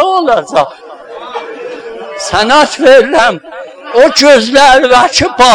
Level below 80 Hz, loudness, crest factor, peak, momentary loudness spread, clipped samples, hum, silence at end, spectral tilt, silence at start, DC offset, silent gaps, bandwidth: -38 dBFS; -7 LUFS; 8 dB; 0 dBFS; 19 LU; 6%; none; 0 s; -2.5 dB/octave; 0 s; under 0.1%; none; 11 kHz